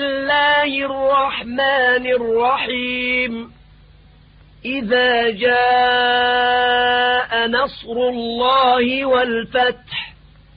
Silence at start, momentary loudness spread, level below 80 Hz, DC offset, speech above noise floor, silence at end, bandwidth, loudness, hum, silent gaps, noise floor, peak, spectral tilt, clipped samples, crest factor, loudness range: 0 s; 8 LU; -48 dBFS; under 0.1%; 30 dB; 0.45 s; 5.2 kHz; -17 LUFS; none; none; -47 dBFS; -4 dBFS; -8.5 dB/octave; under 0.1%; 12 dB; 4 LU